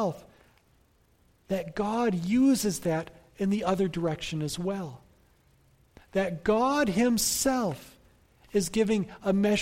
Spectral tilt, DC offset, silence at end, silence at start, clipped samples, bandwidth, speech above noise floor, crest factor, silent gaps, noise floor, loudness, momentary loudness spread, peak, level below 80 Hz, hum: -4.5 dB/octave; under 0.1%; 0 s; 0 s; under 0.1%; 16.5 kHz; 38 dB; 16 dB; none; -64 dBFS; -28 LUFS; 9 LU; -12 dBFS; -54 dBFS; none